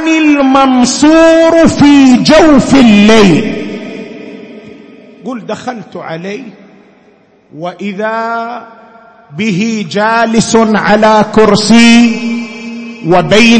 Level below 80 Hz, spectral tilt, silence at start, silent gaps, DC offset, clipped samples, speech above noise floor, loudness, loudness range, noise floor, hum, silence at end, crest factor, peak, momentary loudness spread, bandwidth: -36 dBFS; -5 dB/octave; 0 s; none; under 0.1%; 0.8%; 38 dB; -7 LUFS; 18 LU; -45 dBFS; none; 0 s; 8 dB; 0 dBFS; 19 LU; 11 kHz